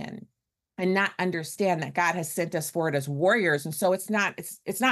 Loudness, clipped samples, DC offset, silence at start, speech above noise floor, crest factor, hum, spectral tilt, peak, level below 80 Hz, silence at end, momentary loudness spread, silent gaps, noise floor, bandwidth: -26 LUFS; under 0.1%; under 0.1%; 0 s; 53 dB; 16 dB; none; -4.5 dB/octave; -12 dBFS; -72 dBFS; 0 s; 9 LU; none; -80 dBFS; 13 kHz